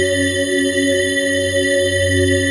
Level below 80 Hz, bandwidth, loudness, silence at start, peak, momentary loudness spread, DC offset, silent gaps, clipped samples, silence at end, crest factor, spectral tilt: -48 dBFS; 11.5 kHz; -16 LUFS; 0 s; -4 dBFS; 2 LU; under 0.1%; none; under 0.1%; 0 s; 12 dB; -3.5 dB/octave